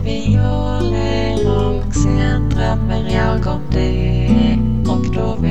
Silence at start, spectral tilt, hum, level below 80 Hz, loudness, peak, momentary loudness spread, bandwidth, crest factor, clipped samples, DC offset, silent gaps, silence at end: 0 s; -7 dB/octave; none; -22 dBFS; -17 LUFS; -2 dBFS; 4 LU; 8.4 kHz; 14 dB; under 0.1%; 6%; none; 0 s